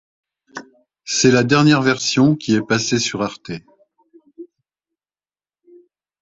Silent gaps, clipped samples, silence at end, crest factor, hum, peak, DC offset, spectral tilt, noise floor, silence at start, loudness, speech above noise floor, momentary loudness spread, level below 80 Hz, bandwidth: none; under 0.1%; 1.75 s; 20 dB; none; 0 dBFS; under 0.1%; -4.5 dB/octave; under -90 dBFS; 0.55 s; -16 LUFS; over 74 dB; 23 LU; -56 dBFS; 8.2 kHz